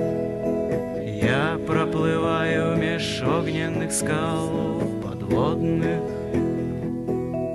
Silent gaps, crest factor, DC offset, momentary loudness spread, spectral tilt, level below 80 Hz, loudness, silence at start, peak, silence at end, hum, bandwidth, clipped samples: none; 16 dB; under 0.1%; 5 LU; -5.5 dB/octave; -44 dBFS; -24 LUFS; 0 s; -8 dBFS; 0 s; none; 13 kHz; under 0.1%